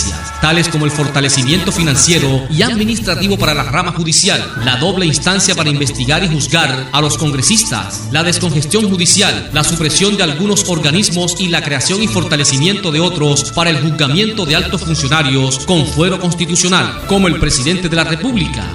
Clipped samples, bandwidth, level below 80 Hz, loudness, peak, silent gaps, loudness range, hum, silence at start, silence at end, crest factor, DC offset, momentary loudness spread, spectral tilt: under 0.1%; over 20 kHz; -32 dBFS; -12 LUFS; 0 dBFS; none; 1 LU; none; 0 s; 0 s; 14 dB; under 0.1%; 4 LU; -3.5 dB/octave